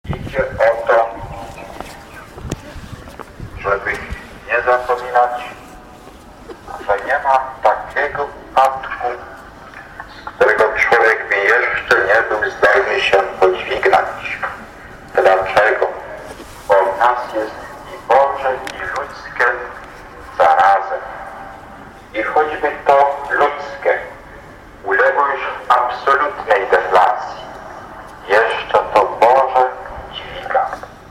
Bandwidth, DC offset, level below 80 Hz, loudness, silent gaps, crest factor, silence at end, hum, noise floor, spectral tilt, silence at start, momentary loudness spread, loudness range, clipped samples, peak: 15.5 kHz; under 0.1%; -42 dBFS; -15 LUFS; none; 14 dB; 0.05 s; none; -38 dBFS; -4.5 dB/octave; 0.05 s; 21 LU; 6 LU; under 0.1%; -2 dBFS